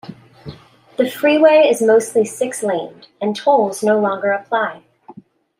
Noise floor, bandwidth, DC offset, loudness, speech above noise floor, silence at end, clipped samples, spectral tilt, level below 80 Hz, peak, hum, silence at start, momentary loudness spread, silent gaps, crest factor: -43 dBFS; 16 kHz; under 0.1%; -16 LUFS; 27 dB; 0.5 s; under 0.1%; -4.5 dB/octave; -64 dBFS; -2 dBFS; none; 0.05 s; 13 LU; none; 14 dB